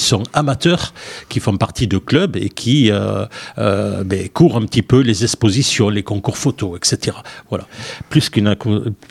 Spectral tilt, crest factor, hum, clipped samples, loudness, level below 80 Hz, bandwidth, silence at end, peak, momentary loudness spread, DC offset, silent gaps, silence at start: -5 dB/octave; 16 dB; none; under 0.1%; -16 LUFS; -42 dBFS; 14.5 kHz; 0.15 s; 0 dBFS; 12 LU; under 0.1%; none; 0 s